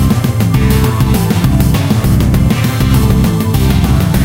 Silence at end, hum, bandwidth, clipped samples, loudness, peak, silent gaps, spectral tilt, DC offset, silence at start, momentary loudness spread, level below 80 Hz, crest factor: 0 s; none; 17.5 kHz; under 0.1%; -11 LUFS; 0 dBFS; none; -6.5 dB/octave; under 0.1%; 0 s; 2 LU; -18 dBFS; 10 dB